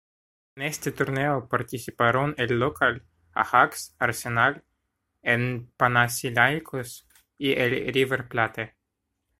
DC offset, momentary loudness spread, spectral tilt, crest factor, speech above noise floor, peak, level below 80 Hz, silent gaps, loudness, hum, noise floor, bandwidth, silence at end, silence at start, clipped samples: under 0.1%; 13 LU; -4.5 dB/octave; 24 dB; 55 dB; -2 dBFS; -58 dBFS; none; -25 LUFS; none; -80 dBFS; 16 kHz; 0.7 s; 0.55 s; under 0.1%